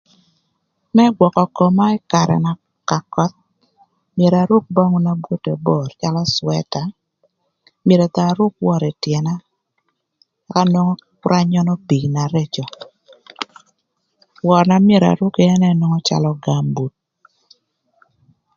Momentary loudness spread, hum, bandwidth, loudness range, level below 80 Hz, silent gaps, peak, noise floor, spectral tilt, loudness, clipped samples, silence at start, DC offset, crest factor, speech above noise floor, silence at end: 12 LU; none; 7.4 kHz; 4 LU; -56 dBFS; none; 0 dBFS; -70 dBFS; -7 dB/octave; -17 LUFS; under 0.1%; 0.95 s; under 0.1%; 18 dB; 55 dB; 1.7 s